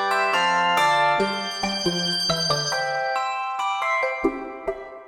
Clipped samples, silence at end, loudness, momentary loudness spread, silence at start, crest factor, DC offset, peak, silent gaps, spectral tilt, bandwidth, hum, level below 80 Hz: under 0.1%; 0 s; -22 LUFS; 8 LU; 0 s; 16 dB; under 0.1%; -8 dBFS; none; -3 dB/octave; 17.5 kHz; none; -54 dBFS